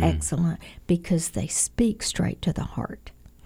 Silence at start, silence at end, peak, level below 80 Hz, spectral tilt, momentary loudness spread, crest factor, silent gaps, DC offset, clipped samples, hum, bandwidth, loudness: 0 s; 0.35 s; -6 dBFS; -40 dBFS; -5 dB/octave; 11 LU; 20 dB; none; under 0.1%; under 0.1%; none; 16 kHz; -26 LUFS